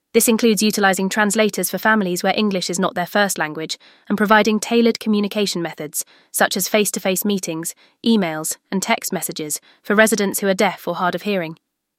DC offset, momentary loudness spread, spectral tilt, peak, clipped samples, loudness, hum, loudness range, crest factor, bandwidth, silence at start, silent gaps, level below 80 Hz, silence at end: under 0.1%; 10 LU; -3.5 dB/octave; -2 dBFS; under 0.1%; -19 LUFS; none; 3 LU; 18 dB; 16.5 kHz; 0.15 s; none; -64 dBFS; 0.45 s